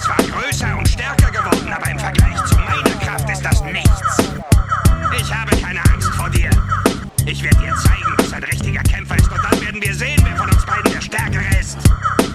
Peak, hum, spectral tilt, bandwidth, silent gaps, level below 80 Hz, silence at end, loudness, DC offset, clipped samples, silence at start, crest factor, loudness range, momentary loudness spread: 0 dBFS; none; -5 dB/octave; 13.5 kHz; none; -20 dBFS; 0 s; -16 LUFS; under 0.1%; under 0.1%; 0 s; 16 dB; 1 LU; 4 LU